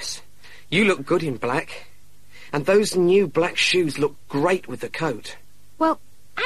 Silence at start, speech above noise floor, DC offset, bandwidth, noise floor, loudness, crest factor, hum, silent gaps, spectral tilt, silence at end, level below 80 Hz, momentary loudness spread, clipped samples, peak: 0 s; 31 dB; 1%; 14 kHz; -52 dBFS; -22 LUFS; 16 dB; none; none; -4.5 dB/octave; 0 s; -56 dBFS; 15 LU; under 0.1%; -6 dBFS